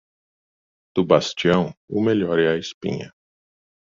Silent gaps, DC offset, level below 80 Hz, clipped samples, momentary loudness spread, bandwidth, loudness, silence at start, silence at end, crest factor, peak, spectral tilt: 1.77-1.88 s, 2.74-2.81 s; under 0.1%; -58 dBFS; under 0.1%; 10 LU; 7.6 kHz; -21 LUFS; 0.95 s; 0.75 s; 22 dB; -2 dBFS; -6 dB/octave